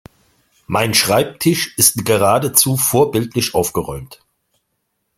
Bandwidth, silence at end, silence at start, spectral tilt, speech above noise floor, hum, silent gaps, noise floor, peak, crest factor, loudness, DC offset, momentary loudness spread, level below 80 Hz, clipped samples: 16.5 kHz; 1.05 s; 0.7 s; -3.5 dB/octave; 55 dB; none; none; -71 dBFS; 0 dBFS; 18 dB; -15 LUFS; under 0.1%; 9 LU; -48 dBFS; under 0.1%